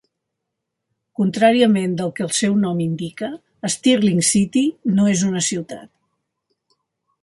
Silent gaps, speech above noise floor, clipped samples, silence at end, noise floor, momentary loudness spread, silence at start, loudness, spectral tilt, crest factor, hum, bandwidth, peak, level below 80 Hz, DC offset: none; 61 dB; under 0.1%; 1.35 s; -79 dBFS; 13 LU; 1.2 s; -18 LUFS; -4.5 dB/octave; 18 dB; none; 11.5 kHz; -2 dBFS; -60 dBFS; under 0.1%